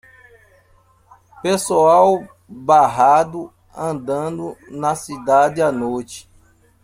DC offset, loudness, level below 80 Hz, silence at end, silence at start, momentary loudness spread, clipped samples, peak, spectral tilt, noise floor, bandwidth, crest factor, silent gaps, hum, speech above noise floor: under 0.1%; -17 LUFS; -56 dBFS; 0.6 s; 1.45 s; 17 LU; under 0.1%; -2 dBFS; -5 dB/octave; -55 dBFS; 16 kHz; 18 dB; none; none; 38 dB